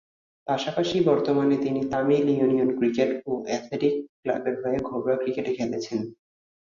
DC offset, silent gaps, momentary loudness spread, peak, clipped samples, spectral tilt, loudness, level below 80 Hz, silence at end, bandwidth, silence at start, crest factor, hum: under 0.1%; 4.09-4.23 s; 8 LU; -8 dBFS; under 0.1%; -6.5 dB/octave; -25 LUFS; -62 dBFS; 0.55 s; 7.4 kHz; 0.45 s; 16 dB; none